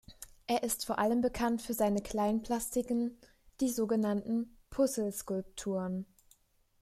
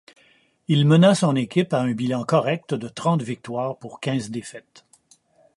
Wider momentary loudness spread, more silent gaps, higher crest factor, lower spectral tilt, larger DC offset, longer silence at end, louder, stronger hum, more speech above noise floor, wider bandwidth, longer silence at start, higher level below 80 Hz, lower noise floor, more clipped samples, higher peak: second, 8 LU vs 15 LU; neither; about the same, 16 dB vs 20 dB; second, -5 dB/octave vs -6.5 dB/octave; neither; second, 0.75 s vs 0.95 s; second, -34 LUFS vs -22 LUFS; neither; about the same, 35 dB vs 38 dB; first, 15 kHz vs 11.5 kHz; second, 0.1 s vs 0.7 s; first, -58 dBFS vs -66 dBFS; first, -68 dBFS vs -59 dBFS; neither; second, -18 dBFS vs -2 dBFS